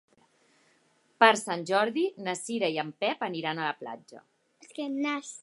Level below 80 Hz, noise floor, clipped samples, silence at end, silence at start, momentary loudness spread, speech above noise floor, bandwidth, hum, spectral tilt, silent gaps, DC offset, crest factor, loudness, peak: -86 dBFS; -68 dBFS; under 0.1%; 0 s; 1.2 s; 17 LU; 39 dB; 11.5 kHz; none; -3.5 dB/octave; none; under 0.1%; 26 dB; -28 LUFS; -4 dBFS